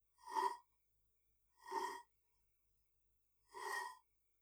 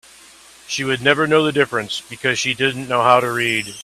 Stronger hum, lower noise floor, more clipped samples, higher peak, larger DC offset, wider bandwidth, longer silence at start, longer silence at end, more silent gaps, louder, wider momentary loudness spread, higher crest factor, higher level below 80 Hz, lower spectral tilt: neither; first, -81 dBFS vs -45 dBFS; neither; second, -26 dBFS vs 0 dBFS; neither; first, over 20 kHz vs 14.5 kHz; second, 0.2 s vs 0.7 s; first, 0.45 s vs 0 s; neither; second, -46 LUFS vs -17 LUFS; first, 18 LU vs 9 LU; first, 24 dB vs 18 dB; second, -88 dBFS vs -58 dBFS; second, -0.5 dB/octave vs -3.5 dB/octave